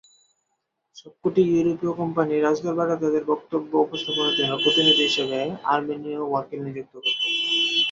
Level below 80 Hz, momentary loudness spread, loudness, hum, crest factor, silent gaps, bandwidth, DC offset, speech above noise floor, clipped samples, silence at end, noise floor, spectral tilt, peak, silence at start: -66 dBFS; 10 LU; -22 LUFS; none; 18 dB; none; 7.8 kHz; under 0.1%; 54 dB; under 0.1%; 0 s; -77 dBFS; -4.5 dB/octave; -6 dBFS; 0.95 s